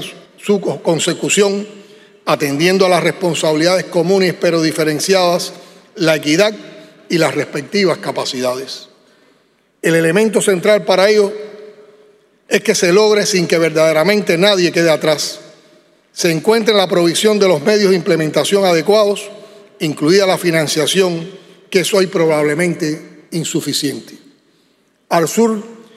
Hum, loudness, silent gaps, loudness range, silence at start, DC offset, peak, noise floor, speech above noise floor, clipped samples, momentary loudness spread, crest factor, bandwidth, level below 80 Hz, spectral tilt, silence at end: none; -14 LUFS; none; 5 LU; 0 s; under 0.1%; 0 dBFS; -57 dBFS; 43 dB; under 0.1%; 11 LU; 14 dB; 15.5 kHz; -66 dBFS; -4 dB/octave; 0.2 s